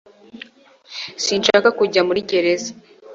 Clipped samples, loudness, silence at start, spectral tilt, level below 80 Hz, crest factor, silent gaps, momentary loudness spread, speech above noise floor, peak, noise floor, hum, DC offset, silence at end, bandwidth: under 0.1%; -17 LUFS; 0.35 s; -3 dB/octave; -62 dBFS; 18 dB; none; 22 LU; 30 dB; -2 dBFS; -47 dBFS; none; under 0.1%; 0 s; 8 kHz